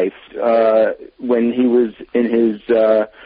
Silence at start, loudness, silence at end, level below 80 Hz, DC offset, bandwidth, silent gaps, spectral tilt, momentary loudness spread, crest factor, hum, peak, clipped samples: 0 s; -16 LUFS; 0.2 s; -58 dBFS; under 0.1%; 5 kHz; none; -11 dB/octave; 7 LU; 12 dB; none; -4 dBFS; under 0.1%